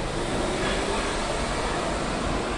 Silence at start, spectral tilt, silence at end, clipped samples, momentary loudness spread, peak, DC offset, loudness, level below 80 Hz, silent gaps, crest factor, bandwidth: 0 s; -4 dB/octave; 0 s; under 0.1%; 2 LU; -14 dBFS; under 0.1%; -27 LUFS; -34 dBFS; none; 12 dB; 11.5 kHz